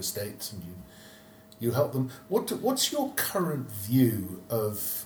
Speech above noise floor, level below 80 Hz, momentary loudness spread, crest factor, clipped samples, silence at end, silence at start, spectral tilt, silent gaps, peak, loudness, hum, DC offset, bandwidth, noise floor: 23 dB; -64 dBFS; 16 LU; 18 dB; under 0.1%; 0 s; 0 s; -4.5 dB/octave; none; -12 dBFS; -29 LUFS; none; under 0.1%; over 20 kHz; -52 dBFS